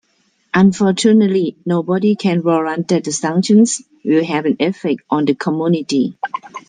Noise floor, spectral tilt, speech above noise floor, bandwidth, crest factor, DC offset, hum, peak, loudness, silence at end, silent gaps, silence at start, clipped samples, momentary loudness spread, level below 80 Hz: -61 dBFS; -5.5 dB/octave; 46 dB; 9.6 kHz; 14 dB; under 0.1%; none; -2 dBFS; -16 LUFS; 0.1 s; none; 0.55 s; under 0.1%; 8 LU; -60 dBFS